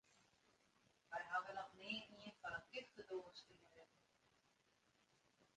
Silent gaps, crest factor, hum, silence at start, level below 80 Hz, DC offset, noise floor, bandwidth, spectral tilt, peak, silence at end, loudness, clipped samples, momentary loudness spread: none; 24 dB; none; 0.15 s; -86 dBFS; under 0.1%; -80 dBFS; 10 kHz; -3.5 dB/octave; -32 dBFS; 0.1 s; -51 LUFS; under 0.1%; 17 LU